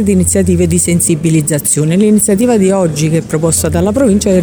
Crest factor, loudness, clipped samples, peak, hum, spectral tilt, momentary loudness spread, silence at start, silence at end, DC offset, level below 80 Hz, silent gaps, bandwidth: 10 dB; -10 LUFS; under 0.1%; 0 dBFS; none; -5.5 dB/octave; 3 LU; 0 s; 0 s; under 0.1%; -32 dBFS; none; over 20 kHz